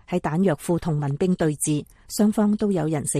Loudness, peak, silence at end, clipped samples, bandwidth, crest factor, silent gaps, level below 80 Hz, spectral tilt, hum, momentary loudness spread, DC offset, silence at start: -23 LUFS; -8 dBFS; 0 s; under 0.1%; 15 kHz; 14 dB; none; -50 dBFS; -6 dB/octave; none; 5 LU; under 0.1%; 0.1 s